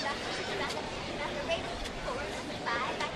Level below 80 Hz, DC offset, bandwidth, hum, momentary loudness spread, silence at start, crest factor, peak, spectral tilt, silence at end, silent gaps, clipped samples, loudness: -50 dBFS; under 0.1%; 13 kHz; none; 4 LU; 0 s; 16 dB; -18 dBFS; -3.5 dB/octave; 0 s; none; under 0.1%; -35 LUFS